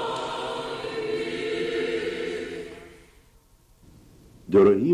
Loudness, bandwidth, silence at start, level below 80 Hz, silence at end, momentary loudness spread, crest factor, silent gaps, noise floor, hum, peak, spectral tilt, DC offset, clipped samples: -26 LUFS; 11 kHz; 0 s; -56 dBFS; 0 s; 19 LU; 18 dB; none; -57 dBFS; none; -8 dBFS; -6 dB/octave; under 0.1%; under 0.1%